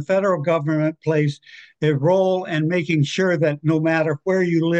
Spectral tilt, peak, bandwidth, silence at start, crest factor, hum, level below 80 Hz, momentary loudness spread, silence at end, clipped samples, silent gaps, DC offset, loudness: -7 dB/octave; -8 dBFS; 8.4 kHz; 0 s; 12 dB; none; -66 dBFS; 4 LU; 0 s; under 0.1%; none; under 0.1%; -20 LUFS